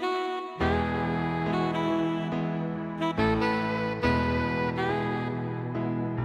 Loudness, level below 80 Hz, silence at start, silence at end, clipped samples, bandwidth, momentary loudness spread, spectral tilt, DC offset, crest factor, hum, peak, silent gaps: -28 LUFS; -46 dBFS; 0 s; 0 s; under 0.1%; 10.5 kHz; 6 LU; -7.5 dB/octave; under 0.1%; 16 dB; none; -12 dBFS; none